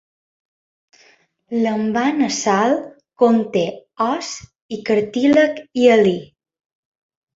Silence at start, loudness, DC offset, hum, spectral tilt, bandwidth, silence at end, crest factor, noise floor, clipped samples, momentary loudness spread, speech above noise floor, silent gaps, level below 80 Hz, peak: 1.5 s; -18 LUFS; under 0.1%; none; -5 dB/octave; 7.8 kHz; 1.15 s; 18 dB; -55 dBFS; under 0.1%; 14 LU; 38 dB; 4.62-4.69 s; -60 dBFS; -2 dBFS